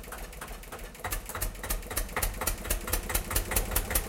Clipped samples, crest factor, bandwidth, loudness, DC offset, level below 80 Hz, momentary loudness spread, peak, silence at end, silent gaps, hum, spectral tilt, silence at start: under 0.1%; 22 dB; 17 kHz; -32 LUFS; under 0.1%; -36 dBFS; 13 LU; -10 dBFS; 0 s; none; none; -2.5 dB/octave; 0 s